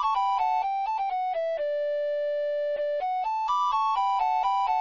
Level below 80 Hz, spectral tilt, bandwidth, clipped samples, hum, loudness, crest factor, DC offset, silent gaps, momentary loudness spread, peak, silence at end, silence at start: -62 dBFS; -0.5 dB/octave; 7.4 kHz; under 0.1%; none; -27 LUFS; 10 dB; 0.1%; none; 4 LU; -16 dBFS; 0 s; 0 s